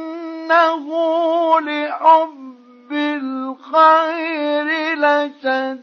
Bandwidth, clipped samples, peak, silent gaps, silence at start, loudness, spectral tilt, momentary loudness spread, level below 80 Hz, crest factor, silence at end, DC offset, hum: 6.6 kHz; under 0.1%; -2 dBFS; none; 0 s; -17 LUFS; -3 dB/octave; 13 LU; -84 dBFS; 16 dB; 0 s; under 0.1%; none